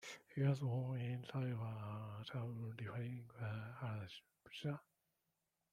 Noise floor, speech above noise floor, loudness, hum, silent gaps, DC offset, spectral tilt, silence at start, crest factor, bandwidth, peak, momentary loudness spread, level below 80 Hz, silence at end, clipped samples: -88 dBFS; 44 dB; -45 LUFS; none; none; under 0.1%; -7 dB/octave; 0 s; 20 dB; 11 kHz; -26 dBFS; 10 LU; -80 dBFS; 0.9 s; under 0.1%